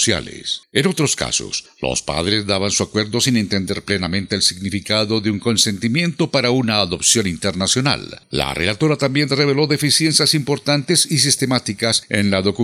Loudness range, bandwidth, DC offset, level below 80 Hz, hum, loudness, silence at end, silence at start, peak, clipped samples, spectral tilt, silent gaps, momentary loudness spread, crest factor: 3 LU; 15.5 kHz; under 0.1%; -48 dBFS; none; -17 LUFS; 0 s; 0 s; 0 dBFS; under 0.1%; -3.5 dB/octave; none; 7 LU; 18 dB